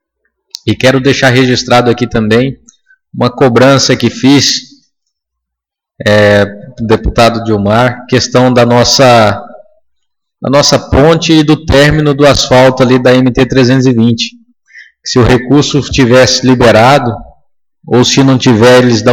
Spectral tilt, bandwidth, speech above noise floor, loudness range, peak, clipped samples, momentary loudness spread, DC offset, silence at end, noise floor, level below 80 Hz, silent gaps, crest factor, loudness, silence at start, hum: -5 dB/octave; 17.5 kHz; 71 dB; 3 LU; 0 dBFS; 0.8%; 9 LU; under 0.1%; 0 s; -78 dBFS; -28 dBFS; none; 8 dB; -7 LUFS; 0.65 s; none